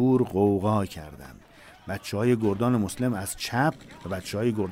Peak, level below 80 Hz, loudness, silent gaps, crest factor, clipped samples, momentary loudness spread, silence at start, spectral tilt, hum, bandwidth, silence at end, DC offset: -10 dBFS; -56 dBFS; -26 LUFS; none; 16 dB; under 0.1%; 18 LU; 0 s; -6.5 dB/octave; none; 16 kHz; 0 s; under 0.1%